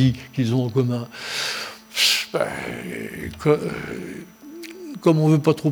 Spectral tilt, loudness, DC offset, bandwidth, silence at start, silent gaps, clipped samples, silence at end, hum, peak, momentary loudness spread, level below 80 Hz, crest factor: -5 dB/octave; -22 LUFS; under 0.1%; over 20 kHz; 0 s; none; under 0.1%; 0 s; none; -2 dBFS; 18 LU; -52 dBFS; 20 dB